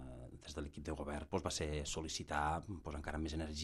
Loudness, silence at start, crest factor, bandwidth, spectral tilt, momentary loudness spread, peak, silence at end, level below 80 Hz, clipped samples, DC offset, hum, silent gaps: -42 LUFS; 0 s; 20 dB; 13 kHz; -4 dB/octave; 9 LU; -22 dBFS; 0 s; -52 dBFS; under 0.1%; under 0.1%; none; none